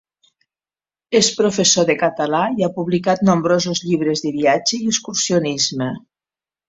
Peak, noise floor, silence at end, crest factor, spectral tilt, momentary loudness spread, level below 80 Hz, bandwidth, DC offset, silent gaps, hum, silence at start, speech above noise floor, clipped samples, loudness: -2 dBFS; under -90 dBFS; 0.7 s; 16 dB; -3.5 dB/octave; 6 LU; -58 dBFS; 8.2 kHz; under 0.1%; none; none; 1.1 s; over 73 dB; under 0.1%; -17 LUFS